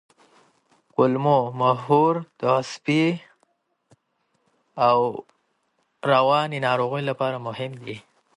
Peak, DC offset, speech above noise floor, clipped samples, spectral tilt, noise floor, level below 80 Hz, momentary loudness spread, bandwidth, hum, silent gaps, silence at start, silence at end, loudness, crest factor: -4 dBFS; under 0.1%; 50 dB; under 0.1%; -6.5 dB/octave; -71 dBFS; -70 dBFS; 14 LU; 11.5 kHz; none; none; 1 s; 0.35 s; -22 LUFS; 18 dB